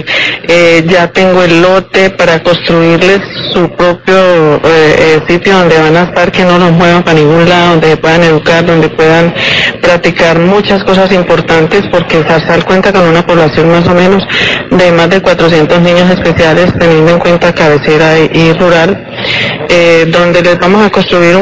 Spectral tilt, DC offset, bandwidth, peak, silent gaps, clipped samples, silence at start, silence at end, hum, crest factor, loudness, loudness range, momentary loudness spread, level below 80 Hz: -6 dB/octave; 2%; 8 kHz; 0 dBFS; none; 8%; 0 s; 0 s; none; 6 dB; -6 LUFS; 1 LU; 3 LU; -32 dBFS